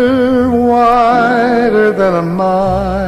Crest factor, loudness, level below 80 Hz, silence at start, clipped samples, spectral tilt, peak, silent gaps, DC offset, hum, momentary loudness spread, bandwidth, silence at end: 10 dB; -11 LUFS; -32 dBFS; 0 s; under 0.1%; -7.5 dB/octave; 0 dBFS; none; under 0.1%; none; 4 LU; 12.5 kHz; 0 s